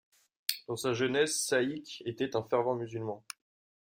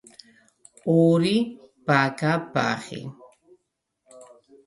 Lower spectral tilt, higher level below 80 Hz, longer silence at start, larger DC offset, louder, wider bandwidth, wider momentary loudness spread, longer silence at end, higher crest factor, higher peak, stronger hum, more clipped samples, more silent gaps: second, -3.5 dB/octave vs -6.5 dB/octave; second, -74 dBFS vs -68 dBFS; second, 0.5 s vs 0.85 s; neither; second, -32 LUFS vs -23 LUFS; first, 16 kHz vs 11.5 kHz; second, 12 LU vs 16 LU; first, 0.7 s vs 0.45 s; about the same, 24 dB vs 22 dB; second, -10 dBFS vs -4 dBFS; neither; neither; neither